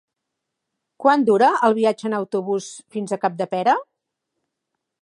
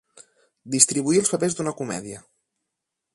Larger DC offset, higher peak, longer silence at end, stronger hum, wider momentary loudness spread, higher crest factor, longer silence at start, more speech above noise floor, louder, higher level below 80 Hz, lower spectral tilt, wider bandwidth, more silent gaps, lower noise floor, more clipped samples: neither; about the same, -2 dBFS vs 0 dBFS; first, 1.2 s vs 0.95 s; neither; second, 11 LU vs 17 LU; second, 20 dB vs 26 dB; first, 1 s vs 0.65 s; about the same, 61 dB vs 60 dB; about the same, -20 LUFS vs -21 LUFS; second, -76 dBFS vs -66 dBFS; first, -5.5 dB/octave vs -3.5 dB/octave; about the same, 11 kHz vs 11.5 kHz; neither; about the same, -81 dBFS vs -83 dBFS; neither